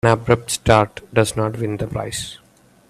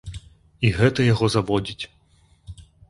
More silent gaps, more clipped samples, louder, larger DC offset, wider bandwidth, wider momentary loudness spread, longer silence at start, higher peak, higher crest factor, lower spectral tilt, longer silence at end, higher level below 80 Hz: neither; neither; about the same, -19 LUFS vs -21 LUFS; neither; first, 14.5 kHz vs 11.5 kHz; second, 11 LU vs 18 LU; about the same, 0.05 s vs 0.05 s; first, 0 dBFS vs -4 dBFS; about the same, 20 dB vs 20 dB; second, -5 dB/octave vs -6.5 dB/octave; first, 0.55 s vs 0.3 s; about the same, -42 dBFS vs -44 dBFS